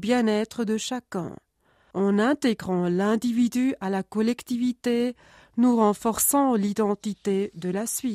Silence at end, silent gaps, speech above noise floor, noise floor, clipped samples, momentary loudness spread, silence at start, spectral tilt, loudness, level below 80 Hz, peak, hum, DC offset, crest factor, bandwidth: 0 s; none; 40 dB; -64 dBFS; under 0.1%; 9 LU; 0 s; -5 dB/octave; -25 LUFS; -62 dBFS; -10 dBFS; none; under 0.1%; 16 dB; 15.5 kHz